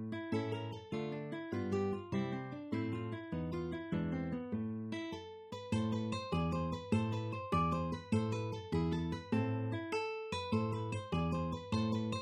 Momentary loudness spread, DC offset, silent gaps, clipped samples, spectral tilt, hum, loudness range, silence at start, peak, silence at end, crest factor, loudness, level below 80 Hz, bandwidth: 6 LU; under 0.1%; none; under 0.1%; -7 dB/octave; none; 3 LU; 0 s; -20 dBFS; 0 s; 18 dB; -38 LUFS; -58 dBFS; 10 kHz